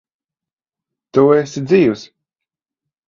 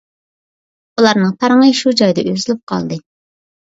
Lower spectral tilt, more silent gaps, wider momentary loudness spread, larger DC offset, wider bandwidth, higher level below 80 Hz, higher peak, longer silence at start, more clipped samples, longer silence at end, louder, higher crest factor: first, -7 dB/octave vs -5 dB/octave; second, none vs 2.63-2.67 s; second, 7 LU vs 13 LU; neither; about the same, 7.4 kHz vs 8 kHz; about the same, -58 dBFS vs -58 dBFS; about the same, 0 dBFS vs 0 dBFS; first, 1.15 s vs 1 s; neither; first, 1.05 s vs 0.65 s; about the same, -14 LUFS vs -13 LUFS; about the same, 18 dB vs 16 dB